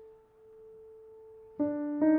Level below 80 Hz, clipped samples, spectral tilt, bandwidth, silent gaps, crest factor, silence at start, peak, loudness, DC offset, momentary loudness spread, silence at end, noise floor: -72 dBFS; under 0.1%; -11 dB/octave; 2.3 kHz; none; 16 dB; 0 s; -16 dBFS; -32 LUFS; under 0.1%; 24 LU; 0 s; -57 dBFS